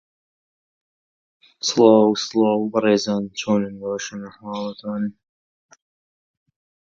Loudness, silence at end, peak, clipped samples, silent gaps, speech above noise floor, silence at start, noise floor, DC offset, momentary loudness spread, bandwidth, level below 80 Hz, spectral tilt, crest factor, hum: -20 LUFS; 1.7 s; 0 dBFS; under 0.1%; none; over 70 dB; 1.65 s; under -90 dBFS; under 0.1%; 16 LU; 7.6 kHz; -66 dBFS; -5 dB/octave; 22 dB; none